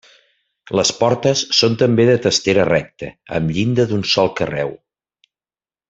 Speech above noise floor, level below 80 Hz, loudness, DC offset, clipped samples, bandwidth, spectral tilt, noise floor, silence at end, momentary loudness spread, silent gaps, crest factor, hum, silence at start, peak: over 74 dB; -50 dBFS; -16 LUFS; under 0.1%; under 0.1%; 8 kHz; -4.5 dB/octave; under -90 dBFS; 1.15 s; 10 LU; none; 16 dB; none; 0.7 s; -2 dBFS